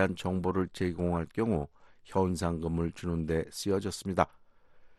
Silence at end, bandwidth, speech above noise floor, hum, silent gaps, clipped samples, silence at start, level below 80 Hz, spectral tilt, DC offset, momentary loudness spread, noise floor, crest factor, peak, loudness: 0.05 s; 12.5 kHz; 25 dB; none; none; under 0.1%; 0 s; -50 dBFS; -6.5 dB/octave; under 0.1%; 3 LU; -56 dBFS; 24 dB; -8 dBFS; -32 LUFS